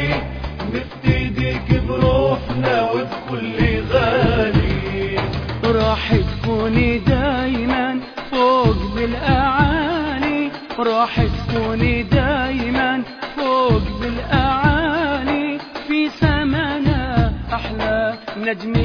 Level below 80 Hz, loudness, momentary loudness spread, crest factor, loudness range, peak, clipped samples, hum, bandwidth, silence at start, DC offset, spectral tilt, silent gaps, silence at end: -28 dBFS; -19 LUFS; 8 LU; 16 dB; 2 LU; -2 dBFS; under 0.1%; none; 5.4 kHz; 0 s; under 0.1%; -8 dB/octave; none; 0 s